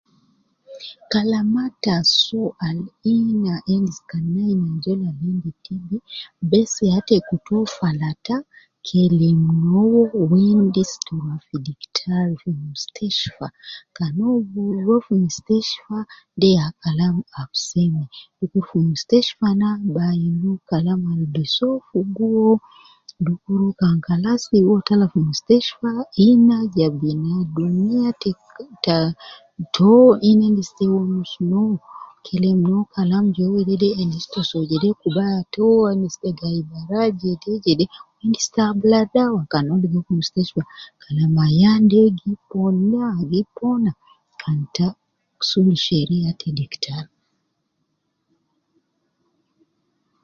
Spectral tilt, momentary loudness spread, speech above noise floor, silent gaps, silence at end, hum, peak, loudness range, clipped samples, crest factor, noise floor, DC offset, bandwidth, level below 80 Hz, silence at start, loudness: -6.5 dB/octave; 12 LU; 54 dB; none; 3.2 s; none; 0 dBFS; 5 LU; under 0.1%; 18 dB; -72 dBFS; under 0.1%; 7.6 kHz; -56 dBFS; 0.7 s; -19 LUFS